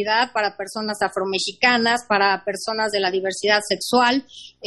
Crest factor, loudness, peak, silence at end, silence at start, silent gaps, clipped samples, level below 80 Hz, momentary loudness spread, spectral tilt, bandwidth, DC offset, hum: 18 dB; -20 LUFS; -2 dBFS; 0 s; 0 s; none; under 0.1%; -62 dBFS; 8 LU; -2.5 dB/octave; 12 kHz; under 0.1%; none